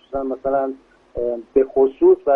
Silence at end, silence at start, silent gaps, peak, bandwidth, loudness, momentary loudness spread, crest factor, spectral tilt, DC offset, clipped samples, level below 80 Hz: 0 s; 0.1 s; none; -4 dBFS; 3.4 kHz; -19 LUFS; 13 LU; 16 dB; -9.5 dB/octave; under 0.1%; under 0.1%; -48 dBFS